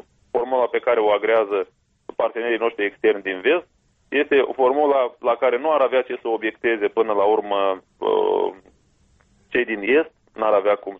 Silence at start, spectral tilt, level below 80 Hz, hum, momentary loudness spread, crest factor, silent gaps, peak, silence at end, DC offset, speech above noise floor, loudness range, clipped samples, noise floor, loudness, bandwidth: 0.35 s; -6.5 dB/octave; -64 dBFS; none; 7 LU; 14 dB; none; -6 dBFS; 0 s; under 0.1%; 39 dB; 2 LU; under 0.1%; -59 dBFS; -21 LUFS; 3.9 kHz